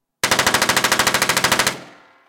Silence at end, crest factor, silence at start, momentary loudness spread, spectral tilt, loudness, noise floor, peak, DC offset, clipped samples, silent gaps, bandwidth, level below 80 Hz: 0.4 s; 16 dB; 0.25 s; 4 LU; -1 dB/octave; -16 LUFS; -43 dBFS; -4 dBFS; under 0.1%; under 0.1%; none; 17.5 kHz; -48 dBFS